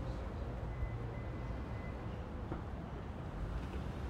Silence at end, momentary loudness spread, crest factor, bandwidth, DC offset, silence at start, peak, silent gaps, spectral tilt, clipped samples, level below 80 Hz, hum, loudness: 0 s; 3 LU; 16 dB; 9.4 kHz; under 0.1%; 0 s; -26 dBFS; none; -8 dB/octave; under 0.1%; -46 dBFS; none; -44 LUFS